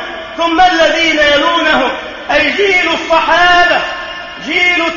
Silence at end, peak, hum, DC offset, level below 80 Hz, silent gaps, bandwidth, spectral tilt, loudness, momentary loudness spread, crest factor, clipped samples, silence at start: 0 s; 0 dBFS; none; under 0.1%; -38 dBFS; none; 7.4 kHz; -2.5 dB/octave; -10 LUFS; 13 LU; 12 dB; under 0.1%; 0 s